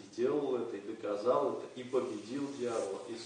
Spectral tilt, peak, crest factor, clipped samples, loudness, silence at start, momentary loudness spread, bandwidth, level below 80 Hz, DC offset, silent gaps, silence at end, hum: -5.5 dB/octave; -18 dBFS; 18 dB; under 0.1%; -36 LUFS; 0 s; 9 LU; 10 kHz; -82 dBFS; under 0.1%; none; 0 s; none